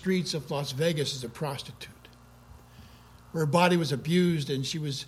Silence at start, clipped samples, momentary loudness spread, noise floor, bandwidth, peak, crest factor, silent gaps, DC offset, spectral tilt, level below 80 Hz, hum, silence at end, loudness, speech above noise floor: 0 s; under 0.1%; 14 LU; -53 dBFS; 15 kHz; -8 dBFS; 20 dB; none; under 0.1%; -5.5 dB/octave; -60 dBFS; none; 0 s; -28 LUFS; 25 dB